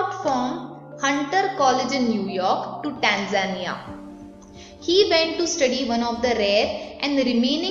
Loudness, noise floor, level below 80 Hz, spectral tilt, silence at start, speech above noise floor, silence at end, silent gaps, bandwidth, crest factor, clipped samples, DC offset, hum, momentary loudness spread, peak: -22 LUFS; -43 dBFS; -54 dBFS; -3.5 dB/octave; 0 s; 21 dB; 0 s; none; 7.8 kHz; 20 dB; under 0.1%; under 0.1%; none; 13 LU; -4 dBFS